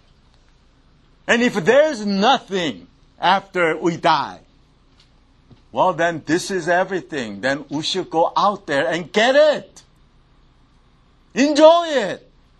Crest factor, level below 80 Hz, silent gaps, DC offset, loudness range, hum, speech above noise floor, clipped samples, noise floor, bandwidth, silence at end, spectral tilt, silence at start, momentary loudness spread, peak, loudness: 20 dB; -56 dBFS; none; under 0.1%; 4 LU; none; 36 dB; under 0.1%; -54 dBFS; 12 kHz; 0.45 s; -4 dB/octave; 1.25 s; 13 LU; 0 dBFS; -18 LUFS